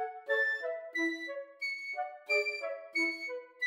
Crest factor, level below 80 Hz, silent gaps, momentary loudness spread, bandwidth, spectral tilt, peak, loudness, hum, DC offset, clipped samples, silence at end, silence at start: 16 dB; under -90 dBFS; none; 9 LU; 16 kHz; 0 dB/octave; -20 dBFS; -34 LUFS; none; under 0.1%; under 0.1%; 0 s; 0 s